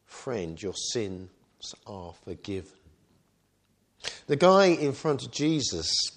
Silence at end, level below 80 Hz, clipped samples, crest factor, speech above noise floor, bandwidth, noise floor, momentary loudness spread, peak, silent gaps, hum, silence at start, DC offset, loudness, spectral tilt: 0.05 s; -60 dBFS; under 0.1%; 22 dB; 43 dB; 10.5 kHz; -70 dBFS; 22 LU; -6 dBFS; none; none; 0.1 s; under 0.1%; -27 LUFS; -4 dB/octave